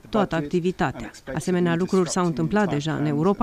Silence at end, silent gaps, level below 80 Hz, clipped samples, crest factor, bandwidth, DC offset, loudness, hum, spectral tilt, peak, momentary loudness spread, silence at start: 0 s; none; -48 dBFS; under 0.1%; 16 dB; 14 kHz; under 0.1%; -23 LUFS; none; -6 dB/octave; -8 dBFS; 5 LU; 0.05 s